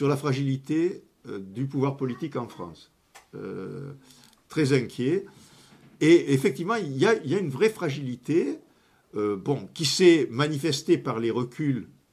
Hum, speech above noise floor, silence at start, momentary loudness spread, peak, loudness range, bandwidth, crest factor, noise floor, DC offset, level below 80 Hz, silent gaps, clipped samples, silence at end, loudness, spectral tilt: none; 33 dB; 0 s; 19 LU; -6 dBFS; 8 LU; 14.5 kHz; 20 dB; -58 dBFS; under 0.1%; -66 dBFS; none; under 0.1%; 0.25 s; -25 LUFS; -5.5 dB/octave